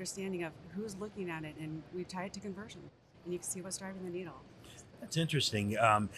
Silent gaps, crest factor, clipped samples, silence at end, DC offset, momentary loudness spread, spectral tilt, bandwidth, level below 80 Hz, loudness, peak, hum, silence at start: none; 24 dB; under 0.1%; 0 s; under 0.1%; 21 LU; -4.5 dB/octave; 13.5 kHz; -68 dBFS; -37 LUFS; -14 dBFS; none; 0 s